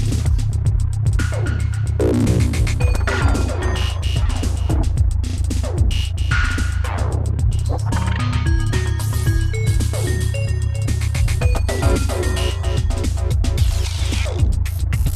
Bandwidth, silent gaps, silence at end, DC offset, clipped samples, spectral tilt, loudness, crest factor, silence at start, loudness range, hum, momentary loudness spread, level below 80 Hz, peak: 14 kHz; none; 0 s; under 0.1%; under 0.1%; -5.5 dB/octave; -20 LUFS; 12 dB; 0 s; 1 LU; none; 3 LU; -22 dBFS; -6 dBFS